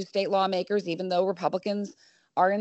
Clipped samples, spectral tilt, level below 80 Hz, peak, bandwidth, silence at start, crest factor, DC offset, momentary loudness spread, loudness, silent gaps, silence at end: under 0.1%; -6 dB/octave; -78 dBFS; -10 dBFS; 8.2 kHz; 0 s; 18 dB; under 0.1%; 8 LU; -28 LUFS; none; 0 s